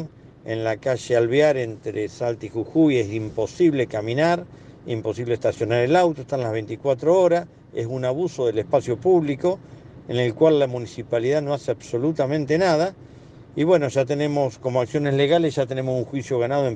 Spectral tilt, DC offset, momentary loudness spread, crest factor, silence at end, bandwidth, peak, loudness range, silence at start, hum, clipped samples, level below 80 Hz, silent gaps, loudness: -6.5 dB/octave; under 0.1%; 10 LU; 16 dB; 0 s; 9.4 kHz; -6 dBFS; 1 LU; 0 s; none; under 0.1%; -58 dBFS; none; -22 LUFS